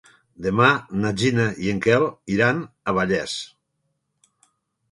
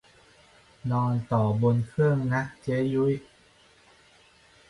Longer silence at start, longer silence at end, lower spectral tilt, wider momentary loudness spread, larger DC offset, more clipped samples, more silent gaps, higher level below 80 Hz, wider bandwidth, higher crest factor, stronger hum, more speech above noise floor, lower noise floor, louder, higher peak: second, 0.4 s vs 0.85 s; about the same, 1.45 s vs 1.5 s; second, -5.5 dB/octave vs -9 dB/octave; first, 11 LU vs 6 LU; neither; neither; neither; first, -52 dBFS vs -58 dBFS; about the same, 11.5 kHz vs 11 kHz; first, 22 dB vs 16 dB; neither; first, 53 dB vs 33 dB; first, -74 dBFS vs -58 dBFS; first, -21 LUFS vs -26 LUFS; first, 0 dBFS vs -12 dBFS